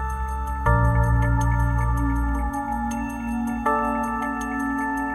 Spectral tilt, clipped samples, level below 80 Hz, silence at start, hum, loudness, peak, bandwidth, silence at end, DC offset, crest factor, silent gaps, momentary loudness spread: -7.5 dB/octave; under 0.1%; -26 dBFS; 0 s; none; -24 LUFS; -6 dBFS; 12.5 kHz; 0 s; under 0.1%; 16 dB; none; 7 LU